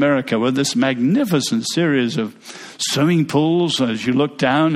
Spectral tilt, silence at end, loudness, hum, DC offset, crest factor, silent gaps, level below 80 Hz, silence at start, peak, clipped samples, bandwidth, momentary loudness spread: -5 dB/octave; 0 s; -18 LUFS; none; under 0.1%; 14 dB; none; -60 dBFS; 0 s; -4 dBFS; under 0.1%; 15 kHz; 7 LU